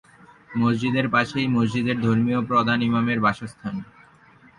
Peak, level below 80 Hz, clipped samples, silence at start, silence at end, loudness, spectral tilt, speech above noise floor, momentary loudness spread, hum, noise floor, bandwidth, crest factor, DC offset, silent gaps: -8 dBFS; -56 dBFS; under 0.1%; 0.5 s; 0.75 s; -22 LUFS; -7 dB/octave; 31 dB; 11 LU; none; -52 dBFS; 10 kHz; 16 dB; under 0.1%; none